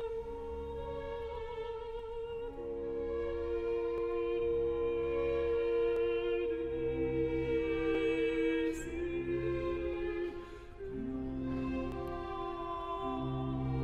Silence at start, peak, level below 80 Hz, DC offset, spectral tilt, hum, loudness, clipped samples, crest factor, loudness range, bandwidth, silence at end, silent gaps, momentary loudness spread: 0 s; -22 dBFS; -48 dBFS; under 0.1%; -7.5 dB/octave; none; -36 LUFS; under 0.1%; 12 dB; 6 LU; 9.4 kHz; 0 s; none; 9 LU